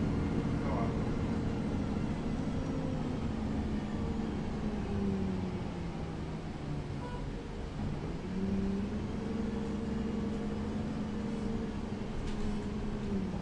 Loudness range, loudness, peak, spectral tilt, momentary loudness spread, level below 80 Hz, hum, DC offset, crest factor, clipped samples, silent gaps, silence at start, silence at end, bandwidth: 3 LU; -36 LUFS; -22 dBFS; -7.5 dB/octave; 6 LU; -44 dBFS; none; under 0.1%; 14 dB; under 0.1%; none; 0 s; 0 s; 10.5 kHz